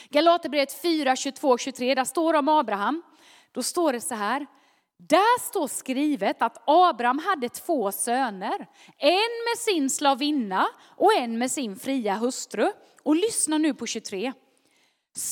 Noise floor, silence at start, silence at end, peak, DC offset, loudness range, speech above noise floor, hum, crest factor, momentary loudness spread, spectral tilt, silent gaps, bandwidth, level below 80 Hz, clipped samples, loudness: -66 dBFS; 0 s; 0 s; -4 dBFS; under 0.1%; 3 LU; 42 dB; none; 20 dB; 10 LU; -2.5 dB/octave; none; 19 kHz; -82 dBFS; under 0.1%; -24 LUFS